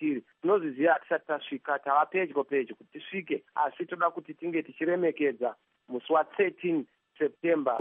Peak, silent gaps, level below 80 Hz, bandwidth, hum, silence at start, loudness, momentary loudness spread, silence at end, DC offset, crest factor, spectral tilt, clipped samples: -12 dBFS; none; -90 dBFS; 3.8 kHz; none; 0 s; -30 LUFS; 11 LU; 0 s; under 0.1%; 18 dB; -4 dB/octave; under 0.1%